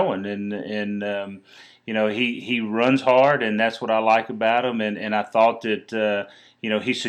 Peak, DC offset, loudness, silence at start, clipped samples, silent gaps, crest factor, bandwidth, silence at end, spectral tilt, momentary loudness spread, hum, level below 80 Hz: -4 dBFS; under 0.1%; -22 LUFS; 0 s; under 0.1%; none; 18 dB; 9.6 kHz; 0 s; -5.5 dB/octave; 11 LU; none; -78 dBFS